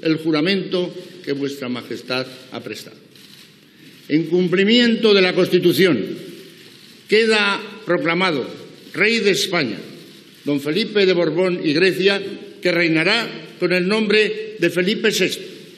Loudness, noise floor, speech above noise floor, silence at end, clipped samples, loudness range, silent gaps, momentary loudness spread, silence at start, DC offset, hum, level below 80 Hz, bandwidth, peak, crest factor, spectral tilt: -18 LUFS; -46 dBFS; 28 dB; 0.05 s; under 0.1%; 7 LU; none; 16 LU; 0.05 s; under 0.1%; none; -84 dBFS; 14.5 kHz; 0 dBFS; 18 dB; -4.5 dB/octave